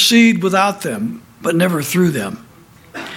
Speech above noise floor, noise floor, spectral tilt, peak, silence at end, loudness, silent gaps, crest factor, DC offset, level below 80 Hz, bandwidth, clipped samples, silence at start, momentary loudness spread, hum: 24 dB; -39 dBFS; -4.5 dB/octave; -2 dBFS; 0 s; -16 LUFS; none; 16 dB; under 0.1%; -56 dBFS; 16.5 kHz; under 0.1%; 0 s; 18 LU; none